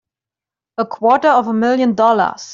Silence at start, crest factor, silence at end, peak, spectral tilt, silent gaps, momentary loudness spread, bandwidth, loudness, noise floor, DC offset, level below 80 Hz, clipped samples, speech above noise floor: 0.8 s; 14 dB; 0 s; -2 dBFS; -5.5 dB/octave; none; 11 LU; 7.6 kHz; -14 LUFS; -88 dBFS; under 0.1%; -64 dBFS; under 0.1%; 74 dB